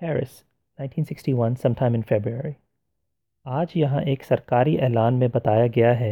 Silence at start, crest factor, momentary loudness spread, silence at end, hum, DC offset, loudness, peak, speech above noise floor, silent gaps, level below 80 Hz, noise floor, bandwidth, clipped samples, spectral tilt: 0 s; 16 dB; 12 LU; 0 s; none; under 0.1%; -22 LUFS; -6 dBFS; 58 dB; none; -58 dBFS; -80 dBFS; 12.5 kHz; under 0.1%; -9 dB/octave